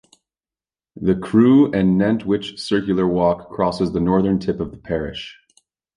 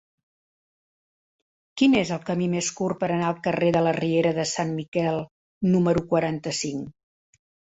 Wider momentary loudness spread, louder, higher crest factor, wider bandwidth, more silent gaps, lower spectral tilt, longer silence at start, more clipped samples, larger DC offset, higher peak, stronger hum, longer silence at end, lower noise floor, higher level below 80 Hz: first, 12 LU vs 9 LU; first, -19 LUFS vs -24 LUFS; about the same, 16 dB vs 18 dB; first, 10.5 kHz vs 8.2 kHz; second, none vs 4.88-4.92 s, 5.31-5.61 s; first, -7.5 dB/octave vs -5.5 dB/octave; second, 0.95 s vs 1.75 s; neither; neither; about the same, -4 dBFS vs -6 dBFS; neither; second, 0.65 s vs 0.8 s; about the same, under -90 dBFS vs under -90 dBFS; first, -44 dBFS vs -58 dBFS